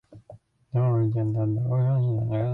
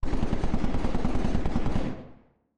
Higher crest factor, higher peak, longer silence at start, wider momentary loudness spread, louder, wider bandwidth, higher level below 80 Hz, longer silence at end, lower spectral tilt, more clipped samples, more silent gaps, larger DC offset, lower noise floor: about the same, 10 dB vs 10 dB; about the same, -14 dBFS vs -14 dBFS; about the same, 0.1 s vs 0 s; second, 3 LU vs 7 LU; first, -25 LUFS vs -31 LUFS; second, 3.7 kHz vs 7 kHz; second, -56 dBFS vs -30 dBFS; second, 0 s vs 0.45 s; first, -12 dB/octave vs -7.5 dB/octave; neither; neither; neither; about the same, -51 dBFS vs -54 dBFS